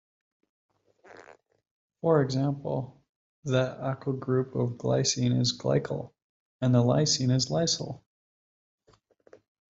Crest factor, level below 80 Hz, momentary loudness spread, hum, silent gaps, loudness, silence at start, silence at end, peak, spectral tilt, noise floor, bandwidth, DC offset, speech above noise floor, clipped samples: 20 dB; -64 dBFS; 12 LU; none; 1.71-1.90 s, 3.09-3.43 s, 6.24-6.60 s; -27 LUFS; 1.1 s; 1.75 s; -10 dBFS; -5 dB/octave; -63 dBFS; 7.8 kHz; under 0.1%; 37 dB; under 0.1%